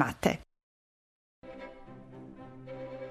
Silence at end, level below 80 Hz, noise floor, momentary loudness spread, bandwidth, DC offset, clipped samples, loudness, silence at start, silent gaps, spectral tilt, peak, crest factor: 0 s; -58 dBFS; under -90 dBFS; 19 LU; 13.5 kHz; under 0.1%; under 0.1%; -36 LUFS; 0 s; 0.63-1.42 s; -5.5 dB/octave; -12 dBFS; 26 dB